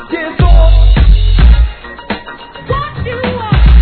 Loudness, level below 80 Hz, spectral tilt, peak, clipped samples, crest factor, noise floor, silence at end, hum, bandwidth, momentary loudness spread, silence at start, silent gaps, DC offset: -12 LUFS; -8 dBFS; -10 dB/octave; 0 dBFS; 2%; 8 dB; -29 dBFS; 0 s; none; 4.5 kHz; 13 LU; 0 s; none; under 0.1%